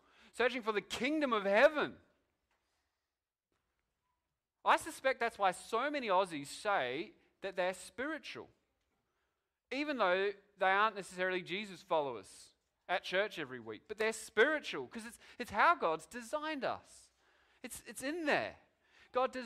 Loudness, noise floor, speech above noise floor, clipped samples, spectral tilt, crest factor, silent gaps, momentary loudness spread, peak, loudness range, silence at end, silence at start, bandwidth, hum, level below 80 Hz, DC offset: -35 LUFS; under -90 dBFS; over 54 dB; under 0.1%; -3.5 dB/octave; 22 dB; none; 16 LU; -16 dBFS; 5 LU; 0 s; 0.35 s; 15.5 kHz; none; -74 dBFS; under 0.1%